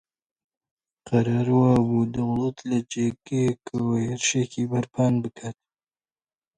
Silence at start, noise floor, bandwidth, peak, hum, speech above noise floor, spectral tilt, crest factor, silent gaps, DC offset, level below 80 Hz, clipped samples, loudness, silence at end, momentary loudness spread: 1.05 s; under -90 dBFS; 9.6 kHz; -8 dBFS; none; over 67 dB; -6 dB/octave; 18 dB; none; under 0.1%; -56 dBFS; under 0.1%; -24 LUFS; 1.05 s; 8 LU